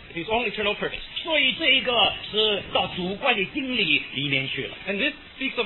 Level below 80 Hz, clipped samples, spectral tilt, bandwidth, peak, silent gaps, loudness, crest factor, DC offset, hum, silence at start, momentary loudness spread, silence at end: -50 dBFS; under 0.1%; -6.5 dB/octave; 4.3 kHz; -8 dBFS; none; -23 LUFS; 18 dB; under 0.1%; none; 0 s; 10 LU; 0 s